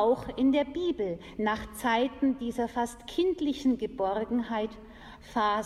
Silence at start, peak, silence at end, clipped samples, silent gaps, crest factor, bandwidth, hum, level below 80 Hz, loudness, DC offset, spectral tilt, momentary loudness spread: 0 s; -14 dBFS; 0 s; under 0.1%; none; 16 dB; 13 kHz; none; -54 dBFS; -30 LUFS; under 0.1%; -5 dB/octave; 8 LU